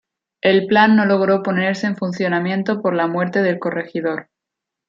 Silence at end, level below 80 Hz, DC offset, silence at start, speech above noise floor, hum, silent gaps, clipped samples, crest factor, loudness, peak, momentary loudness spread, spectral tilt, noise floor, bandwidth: 0.65 s; -64 dBFS; under 0.1%; 0.45 s; 66 dB; none; none; under 0.1%; 16 dB; -18 LUFS; -2 dBFS; 10 LU; -7 dB/octave; -83 dBFS; 7.6 kHz